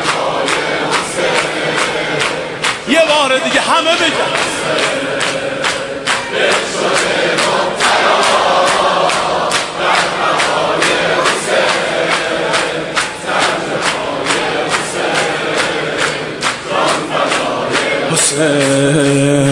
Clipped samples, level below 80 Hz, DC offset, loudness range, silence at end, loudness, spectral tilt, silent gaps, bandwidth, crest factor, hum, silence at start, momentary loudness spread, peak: under 0.1%; -48 dBFS; under 0.1%; 3 LU; 0 s; -13 LUFS; -3 dB/octave; none; 11.5 kHz; 14 dB; none; 0 s; 5 LU; 0 dBFS